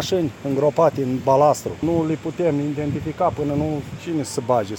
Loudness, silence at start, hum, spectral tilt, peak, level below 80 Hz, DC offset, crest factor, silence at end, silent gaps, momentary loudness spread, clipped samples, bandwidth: -21 LUFS; 0 s; none; -6.5 dB/octave; -4 dBFS; -48 dBFS; under 0.1%; 16 dB; 0 s; none; 9 LU; under 0.1%; 17 kHz